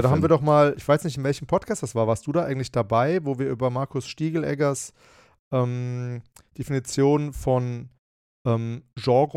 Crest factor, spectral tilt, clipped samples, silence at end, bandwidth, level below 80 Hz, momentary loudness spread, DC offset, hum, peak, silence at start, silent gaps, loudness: 18 dB; -6.5 dB/octave; under 0.1%; 0.05 s; 15 kHz; -52 dBFS; 12 LU; under 0.1%; none; -6 dBFS; 0 s; 5.39-5.51 s, 7.99-8.45 s; -24 LUFS